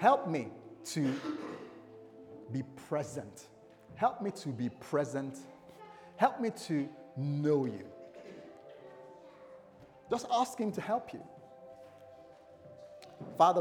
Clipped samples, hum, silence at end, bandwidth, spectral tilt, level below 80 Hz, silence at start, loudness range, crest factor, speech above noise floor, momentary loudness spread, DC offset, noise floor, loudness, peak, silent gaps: under 0.1%; none; 0 s; 19 kHz; -6 dB/octave; -78 dBFS; 0 s; 4 LU; 24 dB; 24 dB; 23 LU; under 0.1%; -57 dBFS; -35 LUFS; -12 dBFS; none